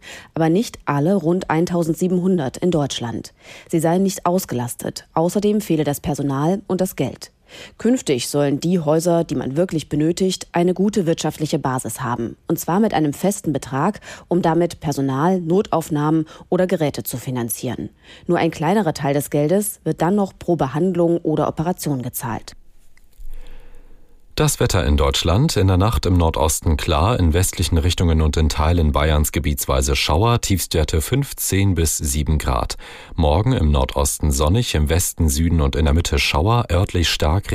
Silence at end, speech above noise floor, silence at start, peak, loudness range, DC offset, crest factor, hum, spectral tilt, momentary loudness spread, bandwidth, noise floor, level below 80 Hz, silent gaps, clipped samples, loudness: 0 s; 25 dB; 0.05 s; -4 dBFS; 4 LU; under 0.1%; 14 dB; none; -5.5 dB/octave; 7 LU; 15.5 kHz; -44 dBFS; -30 dBFS; none; under 0.1%; -19 LUFS